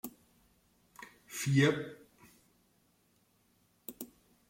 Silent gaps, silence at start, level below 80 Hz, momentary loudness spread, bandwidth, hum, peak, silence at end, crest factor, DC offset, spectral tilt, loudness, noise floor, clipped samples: none; 0.05 s; -74 dBFS; 25 LU; 16.5 kHz; none; -16 dBFS; 0.45 s; 22 dB; under 0.1%; -5.5 dB/octave; -31 LUFS; -72 dBFS; under 0.1%